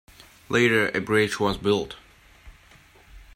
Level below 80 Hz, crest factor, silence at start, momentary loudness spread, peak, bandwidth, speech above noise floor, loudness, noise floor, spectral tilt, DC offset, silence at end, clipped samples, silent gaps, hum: -50 dBFS; 18 dB; 0.5 s; 10 LU; -8 dBFS; 16 kHz; 31 dB; -23 LUFS; -53 dBFS; -5 dB/octave; under 0.1%; 0.15 s; under 0.1%; none; none